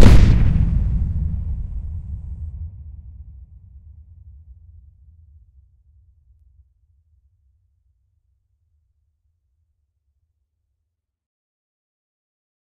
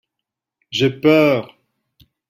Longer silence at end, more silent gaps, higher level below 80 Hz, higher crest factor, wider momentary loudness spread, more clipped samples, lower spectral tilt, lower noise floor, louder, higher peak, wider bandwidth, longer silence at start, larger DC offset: first, 9.6 s vs 0.85 s; neither; first, -24 dBFS vs -60 dBFS; about the same, 20 dB vs 18 dB; first, 30 LU vs 10 LU; first, 0.1% vs under 0.1%; first, -7.5 dB/octave vs -6 dB/octave; second, -78 dBFS vs -83 dBFS; second, -21 LUFS vs -16 LUFS; about the same, 0 dBFS vs -2 dBFS; second, 11 kHz vs 16 kHz; second, 0 s vs 0.7 s; neither